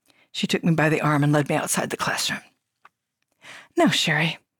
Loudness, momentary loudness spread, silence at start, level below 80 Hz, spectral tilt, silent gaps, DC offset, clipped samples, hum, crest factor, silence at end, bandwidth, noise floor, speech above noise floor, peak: -22 LUFS; 9 LU; 0.35 s; -64 dBFS; -4.5 dB/octave; none; under 0.1%; under 0.1%; none; 16 dB; 0.25 s; 19 kHz; -76 dBFS; 54 dB; -8 dBFS